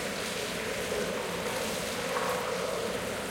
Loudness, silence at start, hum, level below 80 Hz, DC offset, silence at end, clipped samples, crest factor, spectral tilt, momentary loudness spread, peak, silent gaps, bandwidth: -32 LUFS; 0 s; none; -56 dBFS; under 0.1%; 0 s; under 0.1%; 18 dB; -3 dB/octave; 2 LU; -16 dBFS; none; 16.5 kHz